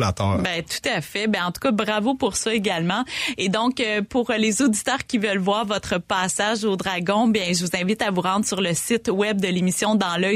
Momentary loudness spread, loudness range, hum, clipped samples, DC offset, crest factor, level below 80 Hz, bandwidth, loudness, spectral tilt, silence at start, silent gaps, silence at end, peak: 4 LU; 1 LU; none; under 0.1%; under 0.1%; 14 dB; -52 dBFS; 15.5 kHz; -22 LUFS; -4 dB/octave; 0 s; none; 0 s; -8 dBFS